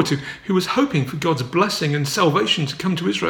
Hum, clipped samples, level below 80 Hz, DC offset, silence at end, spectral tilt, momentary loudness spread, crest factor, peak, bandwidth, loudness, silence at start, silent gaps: none; under 0.1%; -56 dBFS; under 0.1%; 0 s; -5 dB/octave; 5 LU; 18 dB; -2 dBFS; 19 kHz; -20 LUFS; 0 s; none